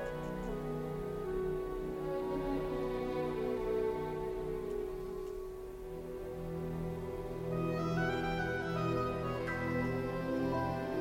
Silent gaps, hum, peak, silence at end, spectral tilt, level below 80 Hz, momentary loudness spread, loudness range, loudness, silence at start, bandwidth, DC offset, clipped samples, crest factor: none; none; -22 dBFS; 0 s; -7.5 dB/octave; -50 dBFS; 8 LU; 5 LU; -38 LUFS; 0 s; 16.5 kHz; under 0.1%; under 0.1%; 14 dB